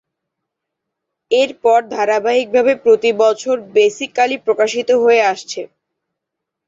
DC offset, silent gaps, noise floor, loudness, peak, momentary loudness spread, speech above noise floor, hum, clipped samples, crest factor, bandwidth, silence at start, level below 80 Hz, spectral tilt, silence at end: under 0.1%; none; -80 dBFS; -15 LUFS; -2 dBFS; 6 LU; 66 dB; none; under 0.1%; 14 dB; 7.8 kHz; 1.3 s; -66 dBFS; -3 dB/octave; 1 s